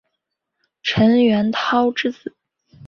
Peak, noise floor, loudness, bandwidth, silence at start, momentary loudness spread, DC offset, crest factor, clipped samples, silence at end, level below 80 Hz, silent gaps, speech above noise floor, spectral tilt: -4 dBFS; -78 dBFS; -18 LUFS; 6.8 kHz; 0.85 s; 14 LU; under 0.1%; 16 dB; under 0.1%; 0 s; -54 dBFS; none; 61 dB; -6 dB/octave